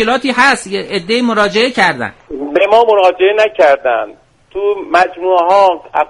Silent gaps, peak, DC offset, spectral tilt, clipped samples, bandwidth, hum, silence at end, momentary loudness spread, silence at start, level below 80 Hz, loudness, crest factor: none; 0 dBFS; under 0.1%; -3.5 dB/octave; under 0.1%; 11.5 kHz; none; 0.05 s; 9 LU; 0 s; -50 dBFS; -11 LUFS; 12 dB